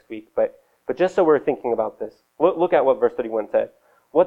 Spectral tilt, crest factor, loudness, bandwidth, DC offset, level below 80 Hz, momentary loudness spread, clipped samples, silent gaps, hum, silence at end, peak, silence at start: -7 dB/octave; 18 dB; -21 LUFS; 7.8 kHz; under 0.1%; -62 dBFS; 14 LU; under 0.1%; none; none; 0 s; -4 dBFS; 0.1 s